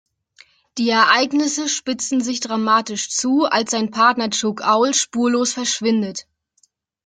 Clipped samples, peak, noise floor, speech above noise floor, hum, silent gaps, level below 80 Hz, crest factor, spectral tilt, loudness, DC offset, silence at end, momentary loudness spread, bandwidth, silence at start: under 0.1%; 0 dBFS; -63 dBFS; 44 dB; none; none; -66 dBFS; 18 dB; -2 dB/octave; -18 LUFS; under 0.1%; 0.85 s; 7 LU; 9.6 kHz; 0.75 s